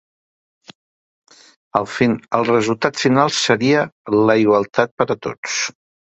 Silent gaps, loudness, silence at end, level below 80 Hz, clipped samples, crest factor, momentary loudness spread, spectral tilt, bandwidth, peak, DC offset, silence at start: 3.92-4.05 s, 4.91-4.98 s, 5.38-5.43 s; -17 LUFS; 0.4 s; -58 dBFS; under 0.1%; 18 dB; 8 LU; -4.5 dB/octave; 8.4 kHz; 0 dBFS; under 0.1%; 1.75 s